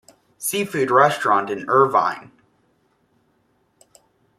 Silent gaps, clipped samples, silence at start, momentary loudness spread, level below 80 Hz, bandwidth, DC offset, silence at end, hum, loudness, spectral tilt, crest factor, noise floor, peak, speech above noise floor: none; under 0.1%; 0.4 s; 9 LU; -68 dBFS; 15.5 kHz; under 0.1%; 2.15 s; none; -19 LUFS; -4 dB/octave; 20 dB; -64 dBFS; -2 dBFS; 46 dB